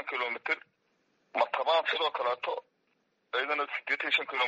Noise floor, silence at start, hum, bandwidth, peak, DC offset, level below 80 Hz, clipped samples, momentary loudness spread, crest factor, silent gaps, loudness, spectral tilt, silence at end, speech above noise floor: -75 dBFS; 0 s; none; 7.6 kHz; -12 dBFS; under 0.1%; -86 dBFS; under 0.1%; 8 LU; 20 dB; none; -31 LUFS; 3.5 dB/octave; 0 s; 44 dB